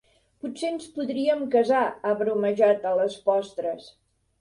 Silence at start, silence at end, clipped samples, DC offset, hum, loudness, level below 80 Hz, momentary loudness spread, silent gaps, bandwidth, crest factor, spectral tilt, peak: 0.45 s; 0.5 s; under 0.1%; under 0.1%; none; -25 LUFS; -70 dBFS; 11 LU; none; 11.5 kHz; 18 dB; -5.5 dB/octave; -8 dBFS